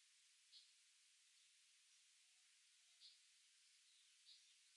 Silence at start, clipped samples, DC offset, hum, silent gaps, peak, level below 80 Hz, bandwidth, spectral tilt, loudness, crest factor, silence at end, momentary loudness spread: 0 s; under 0.1%; under 0.1%; none; none; -54 dBFS; under -90 dBFS; 11 kHz; 4.5 dB/octave; -68 LUFS; 20 dB; 0 s; 1 LU